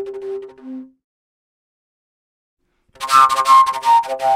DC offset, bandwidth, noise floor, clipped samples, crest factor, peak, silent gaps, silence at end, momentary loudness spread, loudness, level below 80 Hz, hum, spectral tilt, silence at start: under 0.1%; 16 kHz; under -90 dBFS; under 0.1%; 18 dB; 0 dBFS; 1.04-2.57 s; 0 s; 23 LU; -13 LUFS; -64 dBFS; none; -1 dB/octave; 0 s